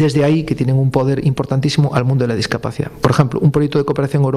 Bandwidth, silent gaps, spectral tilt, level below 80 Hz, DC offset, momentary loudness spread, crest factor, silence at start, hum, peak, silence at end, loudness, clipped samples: 12 kHz; none; -7 dB/octave; -42 dBFS; under 0.1%; 5 LU; 14 dB; 0 s; none; 0 dBFS; 0 s; -16 LUFS; under 0.1%